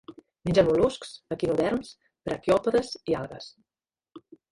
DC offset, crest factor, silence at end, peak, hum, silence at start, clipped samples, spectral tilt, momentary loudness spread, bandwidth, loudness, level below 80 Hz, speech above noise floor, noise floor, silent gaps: under 0.1%; 20 dB; 0.35 s; -8 dBFS; none; 0.1 s; under 0.1%; -6 dB/octave; 17 LU; 11.5 kHz; -26 LUFS; -52 dBFS; over 64 dB; under -90 dBFS; none